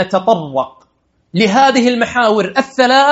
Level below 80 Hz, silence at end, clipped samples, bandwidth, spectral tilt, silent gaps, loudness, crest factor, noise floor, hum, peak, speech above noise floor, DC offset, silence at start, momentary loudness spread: -56 dBFS; 0 s; under 0.1%; 8.2 kHz; -4.5 dB/octave; none; -13 LUFS; 12 dB; -52 dBFS; none; 0 dBFS; 40 dB; under 0.1%; 0 s; 11 LU